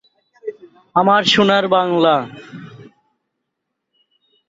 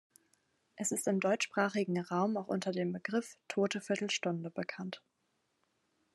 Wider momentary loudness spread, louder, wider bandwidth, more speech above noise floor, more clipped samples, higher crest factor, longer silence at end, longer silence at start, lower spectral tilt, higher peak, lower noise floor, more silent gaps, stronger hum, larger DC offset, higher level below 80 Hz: first, 22 LU vs 9 LU; first, -14 LUFS vs -35 LUFS; second, 7.8 kHz vs 12.5 kHz; first, 62 dB vs 45 dB; neither; about the same, 18 dB vs 20 dB; first, 1.85 s vs 1.15 s; second, 0.45 s vs 0.75 s; about the same, -4.5 dB/octave vs -4.5 dB/octave; first, -2 dBFS vs -16 dBFS; about the same, -77 dBFS vs -80 dBFS; neither; neither; neither; first, -60 dBFS vs -88 dBFS